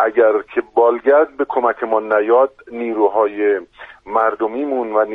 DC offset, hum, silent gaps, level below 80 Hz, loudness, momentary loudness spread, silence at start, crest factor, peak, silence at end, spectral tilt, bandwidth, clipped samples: under 0.1%; none; none; -60 dBFS; -17 LUFS; 7 LU; 0 s; 14 dB; -2 dBFS; 0 s; -7.5 dB/octave; 3.9 kHz; under 0.1%